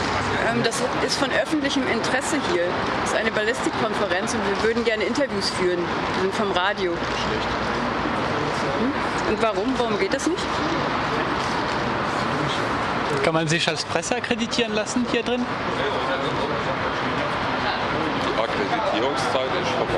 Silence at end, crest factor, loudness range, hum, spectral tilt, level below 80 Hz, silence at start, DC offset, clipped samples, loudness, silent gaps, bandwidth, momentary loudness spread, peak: 0 s; 20 dB; 1 LU; none; -4 dB/octave; -46 dBFS; 0 s; under 0.1%; under 0.1%; -23 LUFS; none; 13 kHz; 3 LU; -4 dBFS